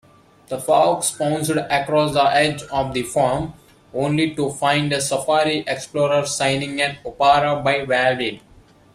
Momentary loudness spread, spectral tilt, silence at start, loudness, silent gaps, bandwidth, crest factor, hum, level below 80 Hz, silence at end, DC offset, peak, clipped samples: 8 LU; -4 dB/octave; 0.5 s; -19 LUFS; none; 15 kHz; 18 dB; none; -50 dBFS; 0.55 s; under 0.1%; -2 dBFS; under 0.1%